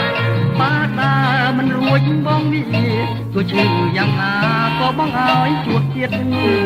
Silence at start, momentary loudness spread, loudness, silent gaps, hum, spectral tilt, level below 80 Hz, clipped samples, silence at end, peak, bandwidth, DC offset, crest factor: 0 s; 4 LU; -16 LUFS; none; none; -7.5 dB/octave; -46 dBFS; under 0.1%; 0 s; -2 dBFS; 15 kHz; under 0.1%; 14 dB